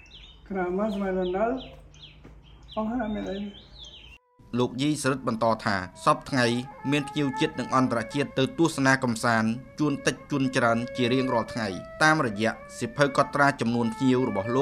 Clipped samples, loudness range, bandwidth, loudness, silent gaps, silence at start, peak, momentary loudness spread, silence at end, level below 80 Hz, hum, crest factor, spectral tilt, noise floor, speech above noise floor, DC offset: under 0.1%; 7 LU; 14 kHz; -26 LUFS; none; 0.15 s; -6 dBFS; 11 LU; 0 s; -54 dBFS; none; 20 dB; -5.5 dB/octave; -51 dBFS; 26 dB; under 0.1%